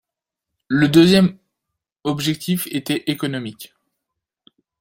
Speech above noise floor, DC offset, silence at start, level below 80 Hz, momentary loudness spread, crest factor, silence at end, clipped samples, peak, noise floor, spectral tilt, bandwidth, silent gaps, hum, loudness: 66 dB; under 0.1%; 0.7 s; -56 dBFS; 16 LU; 18 dB; 1.15 s; under 0.1%; -2 dBFS; -84 dBFS; -5.5 dB/octave; 16.5 kHz; none; none; -18 LUFS